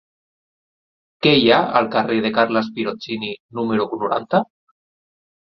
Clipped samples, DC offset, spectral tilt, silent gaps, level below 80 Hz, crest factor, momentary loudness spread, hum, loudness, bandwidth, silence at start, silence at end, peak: under 0.1%; under 0.1%; -7 dB/octave; 3.40-3.49 s; -60 dBFS; 20 dB; 12 LU; none; -19 LUFS; 6.2 kHz; 1.2 s; 1.15 s; -2 dBFS